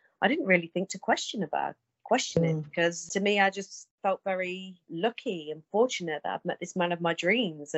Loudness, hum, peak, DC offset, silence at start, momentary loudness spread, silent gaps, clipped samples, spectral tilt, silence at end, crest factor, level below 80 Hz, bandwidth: -29 LUFS; none; -8 dBFS; under 0.1%; 0.2 s; 10 LU; 3.91-3.98 s; under 0.1%; -4.5 dB/octave; 0 s; 20 dB; -70 dBFS; 8.4 kHz